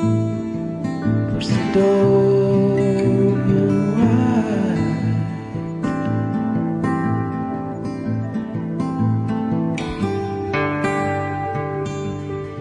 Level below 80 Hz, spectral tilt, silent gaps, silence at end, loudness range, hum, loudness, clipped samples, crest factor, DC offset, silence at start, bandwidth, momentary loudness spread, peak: -46 dBFS; -8 dB/octave; none; 0 s; 6 LU; none; -20 LUFS; under 0.1%; 14 dB; under 0.1%; 0 s; 10.5 kHz; 10 LU; -6 dBFS